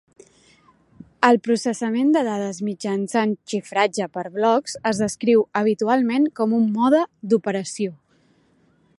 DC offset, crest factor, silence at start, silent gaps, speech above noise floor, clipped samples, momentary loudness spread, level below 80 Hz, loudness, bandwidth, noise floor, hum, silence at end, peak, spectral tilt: under 0.1%; 20 dB; 1.2 s; none; 40 dB; under 0.1%; 9 LU; -66 dBFS; -21 LUFS; 11.5 kHz; -60 dBFS; none; 1.05 s; 0 dBFS; -5 dB/octave